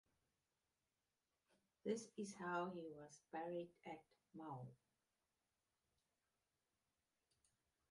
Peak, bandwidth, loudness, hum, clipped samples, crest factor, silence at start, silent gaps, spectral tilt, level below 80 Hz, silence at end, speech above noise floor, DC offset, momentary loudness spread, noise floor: -32 dBFS; 11 kHz; -51 LUFS; none; under 0.1%; 24 dB; 1.85 s; none; -5.5 dB/octave; under -90 dBFS; 3.15 s; over 39 dB; under 0.1%; 13 LU; under -90 dBFS